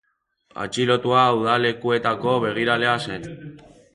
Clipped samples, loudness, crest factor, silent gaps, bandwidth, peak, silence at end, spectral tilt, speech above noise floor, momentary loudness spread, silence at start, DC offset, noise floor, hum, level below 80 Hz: under 0.1%; -20 LUFS; 18 dB; none; 11.5 kHz; -4 dBFS; 0.35 s; -5 dB/octave; 42 dB; 15 LU; 0.55 s; under 0.1%; -63 dBFS; none; -58 dBFS